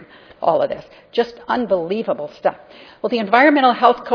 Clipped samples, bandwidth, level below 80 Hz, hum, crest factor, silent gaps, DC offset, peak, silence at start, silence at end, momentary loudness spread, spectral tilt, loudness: under 0.1%; 5.4 kHz; -60 dBFS; none; 18 dB; none; under 0.1%; 0 dBFS; 0 s; 0 s; 12 LU; -6.5 dB/octave; -18 LUFS